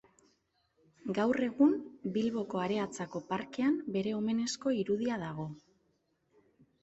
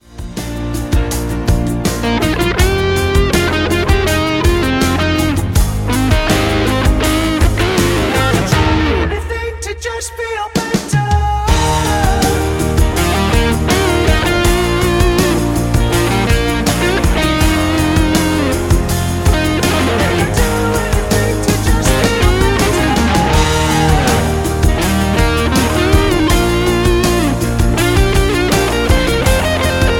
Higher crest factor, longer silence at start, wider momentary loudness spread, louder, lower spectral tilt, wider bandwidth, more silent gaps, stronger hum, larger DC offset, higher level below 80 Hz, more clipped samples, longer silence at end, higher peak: first, 18 dB vs 12 dB; first, 1.05 s vs 0.1 s; first, 12 LU vs 4 LU; second, -33 LUFS vs -14 LUFS; about the same, -5.5 dB/octave vs -5 dB/octave; second, 8.2 kHz vs 17 kHz; neither; neither; neither; second, -72 dBFS vs -18 dBFS; neither; first, 1.25 s vs 0 s; second, -16 dBFS vs 0 dBFS